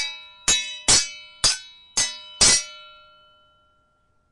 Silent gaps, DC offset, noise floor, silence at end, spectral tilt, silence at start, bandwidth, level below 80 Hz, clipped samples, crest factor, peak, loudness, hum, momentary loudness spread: none; under 0.1%; -65 dBFS; 1.5 s; 0.5 dB/octave; 0 s; 11.5 kHz; -46 dBFS; under 0.1%; 22 dB; -4 dBFS; -20 LUFS; none; 14 LU